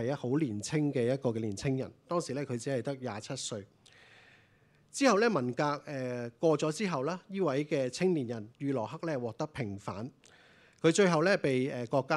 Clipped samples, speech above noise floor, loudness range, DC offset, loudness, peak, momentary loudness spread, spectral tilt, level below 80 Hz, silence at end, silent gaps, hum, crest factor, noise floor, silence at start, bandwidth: under 0.1%; 34 dB; 5 LU; under 0.1%; -32 LUFS; -12 dBFS; 12 LU; -5.5 dB/octave; -70 dBFS; 0 s; none; none; 20 dB; -65 dBFS; 0 s; 12.5 kHz